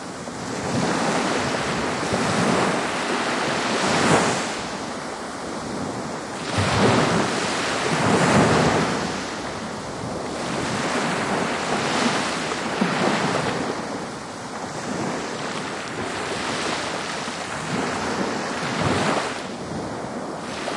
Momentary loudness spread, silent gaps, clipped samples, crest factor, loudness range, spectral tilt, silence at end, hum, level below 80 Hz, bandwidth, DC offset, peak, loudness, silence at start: 12 LU; none; under 0.1%; 18 dB; 6 LU; -4 dB/octave; 0 s; none; -52 dBFS; 11.5 kHz; under 0.1%; -6 dBFS; -23 LUFS; 0 s